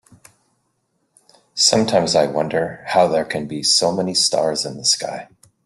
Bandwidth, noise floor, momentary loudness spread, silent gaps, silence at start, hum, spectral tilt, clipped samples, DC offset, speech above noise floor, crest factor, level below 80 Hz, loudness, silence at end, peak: 12.5 kHz; -69 dBFS; 8 LU; none; 1.55 s; none; -2.5 dB/octave; under 0.1%; under 0.1%; 50 dB; 20 dB; -58 dBFS; -17 LUFS; 0.4 s; 0 dBFS